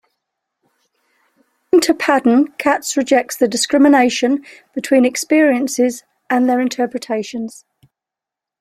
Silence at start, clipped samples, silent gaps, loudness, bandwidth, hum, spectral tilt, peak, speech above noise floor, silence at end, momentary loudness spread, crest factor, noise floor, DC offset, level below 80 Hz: 1.75 s; under 0.1%; none; -15 LUFS; 15.5 kHz; none; -3 dB/octave; -2 dBFS; 71 dB; 1.1 s; 10 LU; 16 dB; -86 dBFS; under 0.1%; -62 dBFS